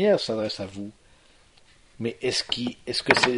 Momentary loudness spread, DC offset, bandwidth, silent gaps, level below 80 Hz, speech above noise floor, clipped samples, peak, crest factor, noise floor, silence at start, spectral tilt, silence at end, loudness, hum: 14 LU; under 0.1%; 11 kHz; none; -58 dBFS; 31 dB; under 0.1%; 0 dBFS; 26 dB; -56 dBFS; 0 s; -3.5 dB/octave; 0 s; -26 LUFS; none